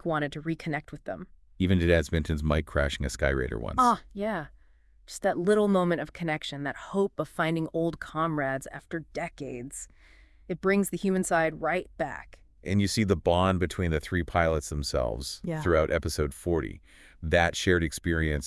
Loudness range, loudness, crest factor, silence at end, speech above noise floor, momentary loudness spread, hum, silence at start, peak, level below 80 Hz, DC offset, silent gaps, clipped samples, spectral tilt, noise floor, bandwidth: 4 LU; -28 LUFS; 20 dB; 0 s; 31 dB; 13 LU; none; 0.05 s; -8 dBFS; -42 dBFS; under 0.1%; none; under 0.1%; -5.5 dB/octave; -58 dBFS; 12 kHz